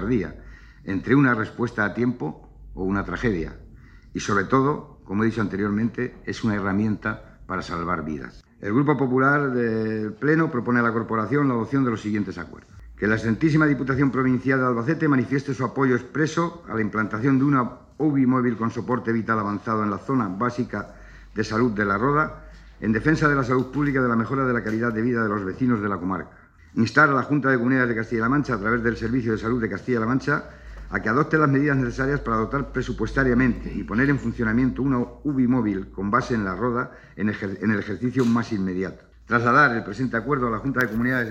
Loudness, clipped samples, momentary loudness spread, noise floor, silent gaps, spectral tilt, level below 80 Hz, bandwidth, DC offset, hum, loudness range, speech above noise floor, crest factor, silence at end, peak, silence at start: -23 LUFS; under 0.1%; 10 LU; -46 dBFS; none; -7.5 dB/octave; -44 dBFS; 8 kHz; under 0.1%; none; 3 LU; 24 dB; 20 dB; 0 s; -4 dBFS; 0 s